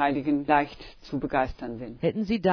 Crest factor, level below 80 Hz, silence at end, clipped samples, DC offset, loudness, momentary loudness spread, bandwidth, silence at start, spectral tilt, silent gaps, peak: 18 dB; -48 dBFS; 0 s; under 0.1%; under 0.1%; -27 LUFS; 13 LU; 5.4 kHz; 0 s; -8 dB/octave; none; -8 dBFS